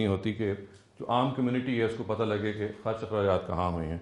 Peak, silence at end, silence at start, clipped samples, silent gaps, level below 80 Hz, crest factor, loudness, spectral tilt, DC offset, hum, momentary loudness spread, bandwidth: -12 dBFS; 0 s; 0 s; under 0.1%; none; -56 dBFS; 18 dB; -30 LUFS; -8 dB/octave; under 0.1%; none; 6 LU; 10.5 kHz